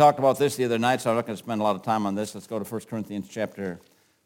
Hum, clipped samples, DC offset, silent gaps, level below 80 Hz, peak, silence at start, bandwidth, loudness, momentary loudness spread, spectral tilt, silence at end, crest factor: none; under 0.1%; under 0.1%; none; -72 dBFS; -4 dBFS; 0 s; 17 kHz; -26 LUFS; 11 LU; -5.5 dB/octave; 0.45 s; 20 dB